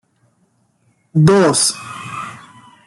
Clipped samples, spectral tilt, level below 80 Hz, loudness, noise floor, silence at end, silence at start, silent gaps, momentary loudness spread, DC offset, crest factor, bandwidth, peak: under 0.1%; -4.5 dB/octave; -52 dBFS; -13 LUFS; -61 dBFS; 0.5 s; 1.15 s; none; 18 LU; under 0.1%; 16 dB; 12.5 kHz; -2 dBFS